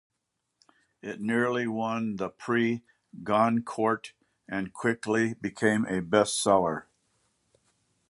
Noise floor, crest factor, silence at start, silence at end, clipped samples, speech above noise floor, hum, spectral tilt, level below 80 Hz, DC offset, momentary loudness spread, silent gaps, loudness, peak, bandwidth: -81 dBFS; 22 dB; 1.05 s; 1.3 s; under 0.1%; 54 dB; none; -5 dB/octave; -66 dBFS; under 0.1%; 12 LU; none; -28 LUFS; -8 dBFS; 11.5 kHz